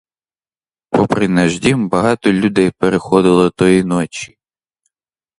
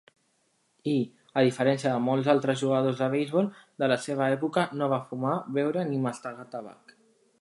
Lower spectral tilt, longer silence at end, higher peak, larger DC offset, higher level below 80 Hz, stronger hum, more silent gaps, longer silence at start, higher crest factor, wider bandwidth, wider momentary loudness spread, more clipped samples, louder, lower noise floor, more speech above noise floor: about the same, -6 dB/octave vs -6.5 dB/octave; first, 1.15 s vs 0.7 s; first, 0 dBFS vs -8 dBFS; neither; first, -46 dBFS vs -76 dBFS; neither; neither; about the same, 0.9 s vs 0.85 s; about the same, 16 dB vs 20 dB; about the same, 11 kHz vs 11.5 kHz; second, 7 LU vs 12 LU; neither; first, -14 LUFS vs -27 LUFS; first, under -90 dBFS vs -71 dBFS; first, over 77 dB vs 44 dB